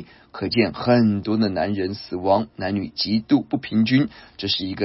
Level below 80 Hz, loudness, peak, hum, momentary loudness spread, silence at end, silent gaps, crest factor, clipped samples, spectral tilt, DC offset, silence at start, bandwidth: -54 dBFS; -22 LUFS; -6 dBFS; none; 9 LU; 0 s; none; 16 dB; under 0.1%; -9.5 dB/octave; under 0.1%; 0 s; 5.8 kHz